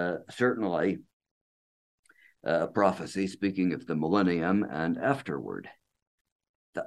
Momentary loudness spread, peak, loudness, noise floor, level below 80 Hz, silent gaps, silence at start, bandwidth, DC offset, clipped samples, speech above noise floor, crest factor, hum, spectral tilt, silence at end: 11 LU; -8 dBFS; -29 LUFS; under -90 dBFS; -66 dBFS; 1.13-1.20 s, 1.31-2.03 s, 6.02-6.25 s, 6.32-6.39 s, 6.49-6.73 s; 0 s; 12 kHz; under 0.1%; under 0.1%; over 61 dB; 22 dB; none; -7 dB/octave; 0 s